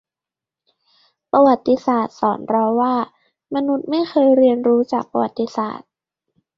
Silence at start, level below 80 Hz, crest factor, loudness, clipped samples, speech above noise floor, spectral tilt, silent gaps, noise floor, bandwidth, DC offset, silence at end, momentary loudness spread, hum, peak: 1.35 s; -64 dBFS; 16 dB; -18 LUFS; under 0.1%; 71 dB; -7 dB/octave; none; -88 dBFS; 7.2 kHz; under 0.1%; 0.8 s; 10 LU; none; -2 dBFS